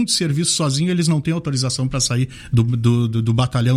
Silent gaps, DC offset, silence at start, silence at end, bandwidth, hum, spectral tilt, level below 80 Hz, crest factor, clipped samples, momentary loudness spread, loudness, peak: none; under 0.1%; 0 s; 0 s; 14 kHz; none; -5 dB/octave; -42 dBFS; 14 dB; under 0.1%; 3 LU; -18 LUFS; -4 dBFS